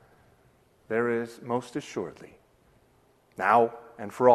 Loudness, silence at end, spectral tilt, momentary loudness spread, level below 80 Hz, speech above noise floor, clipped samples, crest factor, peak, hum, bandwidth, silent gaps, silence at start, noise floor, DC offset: -28 LUFS; 0 s; -6 dB/octave; 18 LU; -70 dBFS; 37 dB; under 0.1%; 22 dB; -6 dBFS; none; 13 kHz; none; 0.9 s; -63 dBFS; under 0.1%